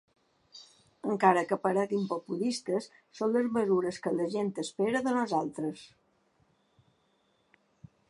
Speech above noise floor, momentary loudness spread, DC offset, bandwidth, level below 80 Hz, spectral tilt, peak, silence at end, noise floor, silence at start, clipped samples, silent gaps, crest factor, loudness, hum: 42 dB; 12 LU; under 0.1%; 11.5 kHz; -76 dBFS; -5.5 dB/octave; -8 dBFS; 2.25 s; -72 dBFS; 0.55 s; under 0.1%; none; 24 dB; -30 LUFS; none